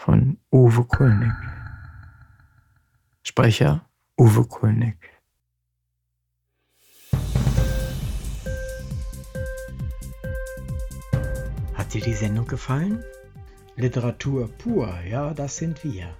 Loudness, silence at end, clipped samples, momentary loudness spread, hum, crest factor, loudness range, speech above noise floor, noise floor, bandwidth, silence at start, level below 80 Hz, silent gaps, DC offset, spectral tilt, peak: -23 LUFS; 0.05 s; under 0.1%; 16 LU; none; 18 dB; 9 LU; 56 dB; -76 dBFS; 18 kHz; 0 s; -34 dBFS; none; under 0.1%; -7 dB/octave; -6 dBFS